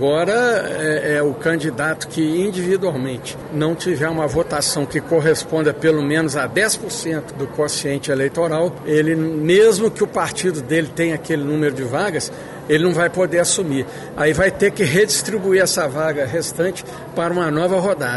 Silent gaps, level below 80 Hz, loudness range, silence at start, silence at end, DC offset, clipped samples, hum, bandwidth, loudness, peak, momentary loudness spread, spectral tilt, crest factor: none; -48 dBFS; 3 LU; 0 s; 0 s; under 0.1%; under 0.1%; none; 12 kHz; -18 LUFS; -4 dBFS; 7 LU; -4.5 dB/octave; 14 dB